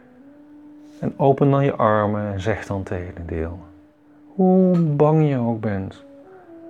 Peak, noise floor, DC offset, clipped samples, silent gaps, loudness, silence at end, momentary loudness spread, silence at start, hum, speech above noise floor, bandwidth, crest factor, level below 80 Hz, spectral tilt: -2 dBFS; -50 dBFS; under 0.1%; under 0.1%; none; -20 LUFS; 0 s; 14 LU; 0.65 s; none; 31 dB; 7.8 kHz; 18 dB; -48 dBFS; -9.5 dB/octave